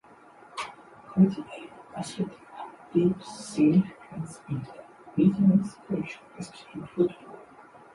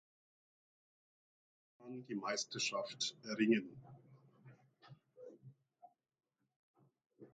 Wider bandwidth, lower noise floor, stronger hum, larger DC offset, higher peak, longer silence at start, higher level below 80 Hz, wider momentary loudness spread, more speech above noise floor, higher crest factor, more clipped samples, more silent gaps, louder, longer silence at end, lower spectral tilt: first, 11.5 kHz vs 9 kHz; second, -53 dBFS vs -68 dBFS; neither; neither; first, -10 dBFS vs -22 dBFS; second, 0.55 s vs 1.8 s; first, -64 dBFS vs -88 dBFS; second, 20 LU vs 24 LU; about the same, 27 dB vs 28 dB; second, 18 dB vs 24 dB; neither; second, none vs 6.56-6.74 s, 7.06-7.10 s; first, -27 LUFS vs -39 LUFS; first, 0.5 s vs 0.05 s; first, -7.5 dB/octave vs -3.5 dB/octave